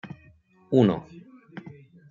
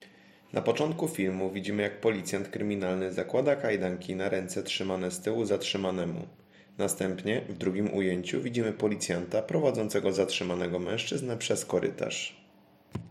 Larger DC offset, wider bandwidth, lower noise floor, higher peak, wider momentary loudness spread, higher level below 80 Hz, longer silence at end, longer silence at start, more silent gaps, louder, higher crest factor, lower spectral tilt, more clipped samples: neither; second, 7.4 kHz vs 16 kHz; about the same, -57 dBFS vs -60 dBFS; first, -6 dBFS vs -12 dBFS; first, 26 LU vs 5 LU; first, -64 dBFS vs -72 dBFS; first, 0.4 s vs 0 s; about the same, 0.05 s vs 0 s; neither; first, -23 LUFS vs -31 LUFS; about the same, 22 dB vs 20 dB; first, -9 dB/octave vs -4.5 dB/octave; neither